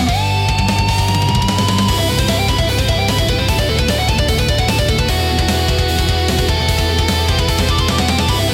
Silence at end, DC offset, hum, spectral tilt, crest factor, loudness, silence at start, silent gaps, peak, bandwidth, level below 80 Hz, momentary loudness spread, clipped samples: 0 s; under 0.1%; none; -4.5 dB/octave; 10 dB; -15 LUFS; 0 s; none; -4 dBFS; 17 kHz; -22 dBFS; 1 LU; under 0.1%